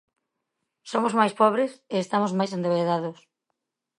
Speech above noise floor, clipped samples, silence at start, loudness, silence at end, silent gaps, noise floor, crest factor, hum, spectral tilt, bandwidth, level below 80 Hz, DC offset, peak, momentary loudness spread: 57 dB; under 0.1%; 0.85 s; -24 LUFS; 0.85 s; none; -81 dBFS; 20 dB; none; -6 dB/octave; 11 kHz; -78 dBFS; under 0.1%; -6 dBFS; 9 LU